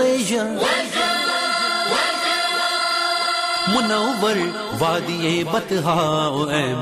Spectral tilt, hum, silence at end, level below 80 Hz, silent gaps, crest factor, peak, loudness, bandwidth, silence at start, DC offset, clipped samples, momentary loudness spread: -3.5 dB/octave; none; 0 s; -56 dBFS; none; 12 dB; -8 dBFS; -19 LUFS; 15 kHz; 0 s; under 0.1%; under 0.1%; 3 LU